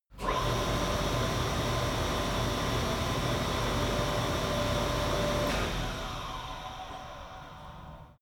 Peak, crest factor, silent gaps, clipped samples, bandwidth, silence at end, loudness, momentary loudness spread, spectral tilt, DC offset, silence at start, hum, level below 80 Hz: -18 dBFS; 14 dB; none; under 0.1%; over 20 kHz; 0.1 s; -31 LUFS; 14 LU; -4.5 dB/octave; under 0.1%; 0.1 s; none; -40 dBFS